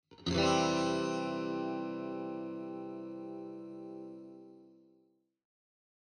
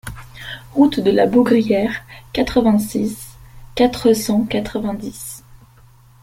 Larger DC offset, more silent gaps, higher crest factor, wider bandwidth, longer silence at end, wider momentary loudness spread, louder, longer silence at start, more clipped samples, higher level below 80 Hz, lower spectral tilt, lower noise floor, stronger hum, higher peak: neither; neither; about the same, 20 dB vs 16 dB; second, 9.8 kHz vs 16.5 kHz; first, 1.3 s vs 0.85 s; about the same, 18 LU vs 18 LU; second, -36 LUFS vs -17 LUFS; about the same, 0.1 s vs 0.05 s; neither; second, -64 dBFS vs -42 dBFS; about the same, -5 dB/octave vs -5.5 dB/octave; first, -72 dBFS vs -47 dBFS; neither; second, -18 dBFS vs -2 dBFS